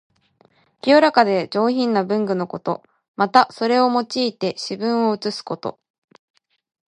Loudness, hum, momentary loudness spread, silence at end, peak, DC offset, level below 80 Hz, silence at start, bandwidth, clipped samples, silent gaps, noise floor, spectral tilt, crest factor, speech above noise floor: -19 LUFS; none; 12 LU; 1.2 s; 0 dBFS; under 0.1%; -72 dBFS; 0.85 s; 11 kHz; under 0.1%; 3.08-3.14 s; -59 dBFS; -5.5 dB/octave; 20 dB; 40 dB